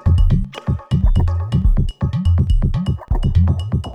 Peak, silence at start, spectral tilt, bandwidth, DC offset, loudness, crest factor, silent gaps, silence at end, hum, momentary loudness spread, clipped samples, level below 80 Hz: -4 dBFS; 0.05 s; -8.5 dB/octave; 5.6 kHz; under 0.1%; -18 LUFS; 12 dB; none; 0 s; none; 5 LU; under 0.1%; -18 dBFS